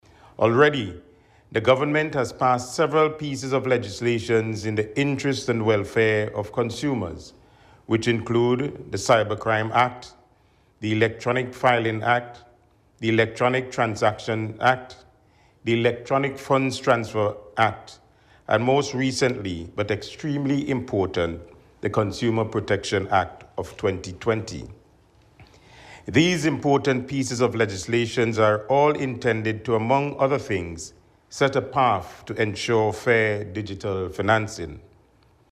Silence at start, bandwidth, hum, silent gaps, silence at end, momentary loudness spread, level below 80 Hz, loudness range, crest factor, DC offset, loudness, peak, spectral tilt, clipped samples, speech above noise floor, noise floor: 0.4 s; 13.5 kHz; none; none; 0.75 s; 9 LU; -54 dBFS; 3 LU; 18 dB; under 0.1%; -23 LUFS; -6 dBFS; -5.5 dB/octave; under 0.1%; 37 dB; -59 dBFS